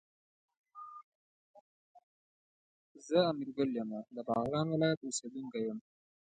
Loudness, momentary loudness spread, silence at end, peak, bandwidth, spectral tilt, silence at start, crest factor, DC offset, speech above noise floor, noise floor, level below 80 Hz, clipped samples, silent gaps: -35 LUFS; 20 LU; 0.6 s; -16 dBFS; 9 kHz; -5.5 dB/octave; 0.75 s; 22 dB; under 0.1%; over 55 dB; under -90 dBFS; -76 dBFS; under 0.1%; 1.04-1.54 s, 1.61-1.95 s, 2.03-2.95 s, 4.97-5.01 s